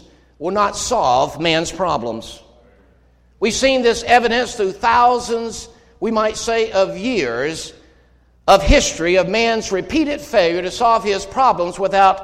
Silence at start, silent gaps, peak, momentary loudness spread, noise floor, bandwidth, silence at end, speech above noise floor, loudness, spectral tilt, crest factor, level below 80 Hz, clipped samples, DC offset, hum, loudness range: 0.4 s; none; 0 dBFS; 10 LU; -53 dBFS; 15.5 kHz; 0 s; 36 dB; -17 LUFS; -3.5 dB/octave; 16 dB; -34 dBFS; under 0.1%; under 0.1%; none; 4 LU